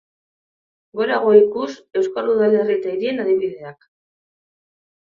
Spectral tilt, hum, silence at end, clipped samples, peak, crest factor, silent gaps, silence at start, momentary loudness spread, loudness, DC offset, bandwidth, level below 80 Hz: -6.5 dB/octave; none; 1.4 s; under 0.1%; 0 dBFS; 20 dB; none; 0.95 s; 14 LU; -18 LUFS; under 0.1%; 7.2 kHz; -68 dBFS